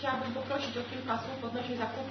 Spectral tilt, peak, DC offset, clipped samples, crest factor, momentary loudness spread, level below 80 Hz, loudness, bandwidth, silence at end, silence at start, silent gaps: -3 dB/octave; -18 dBFS; under 0.1%; under 0.1%; 18 dB; 3 LU; -68 dBFS; -35 LUFS; 6.2 kHz; 0 s; 0 s; none